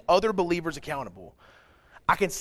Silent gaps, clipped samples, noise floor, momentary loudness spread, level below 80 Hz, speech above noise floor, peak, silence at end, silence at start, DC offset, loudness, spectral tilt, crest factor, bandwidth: none; under 0.1%; -56 dBFS; 12 LU; -52 dBFS; 29 dB; -6 dBFS; 0 s; 0.1 s; under 0.1%; -27 LUFS; -4.5 dB/octave; 22 dB; 15.5 kHz